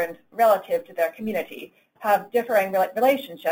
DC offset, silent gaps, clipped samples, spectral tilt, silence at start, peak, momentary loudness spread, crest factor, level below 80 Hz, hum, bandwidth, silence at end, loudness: under 0.1%; none; under 0.1%; -4.5 dB/octave; 0 s; -6 dBFS; 10 LU; 16 dB; -72 dBFS; none; 17 kHz; 0 s; -23 LUFS